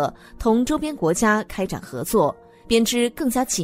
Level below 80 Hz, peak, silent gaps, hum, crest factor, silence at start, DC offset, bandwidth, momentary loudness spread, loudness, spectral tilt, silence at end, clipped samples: -42 dBFS; -4 dBFS; none; none; 18 dB; 0 s; under 0.1%; 16 kHz; 9 LU; -22 LUFS; -4 dB/octave; 0 s; under 0.1%